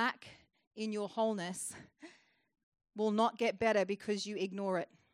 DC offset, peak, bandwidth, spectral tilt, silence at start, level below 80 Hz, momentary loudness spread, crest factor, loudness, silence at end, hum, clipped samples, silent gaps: under 0.1%; -18 dBFS; 13.5 kHz; -4.5 dB/octave; 0 s; -78 dBFS; 20 LU; 20 dB; -36 LUFS; 0.3 s; none; under 0.1%; 0.67-0.71 s, 2.63-2.72 s